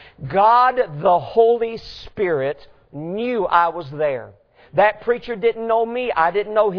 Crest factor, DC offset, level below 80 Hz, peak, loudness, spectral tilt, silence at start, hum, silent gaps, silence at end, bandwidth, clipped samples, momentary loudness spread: 18 dB; under 0.1%; -52 dBFS; -2 dBFS; -19 LUFS; -7.5 dB/octave; 0.2 s; none; none; 0 s; 5.4 kHz; under 0.1%; 14 LU